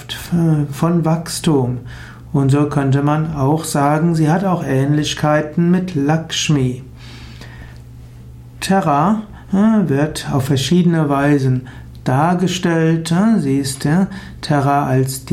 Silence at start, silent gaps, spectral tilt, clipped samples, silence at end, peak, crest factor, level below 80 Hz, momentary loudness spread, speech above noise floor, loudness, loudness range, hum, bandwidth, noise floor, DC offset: 0 s; none; -6 dB/octave; under 0.1%; 0 s; -4 dBFS; 12 dB; -42 dBFS; 13 LU; 21 dB; -16 LUFS; 4 LU; none; 16 kHz; -36 dBFS; under 0.1%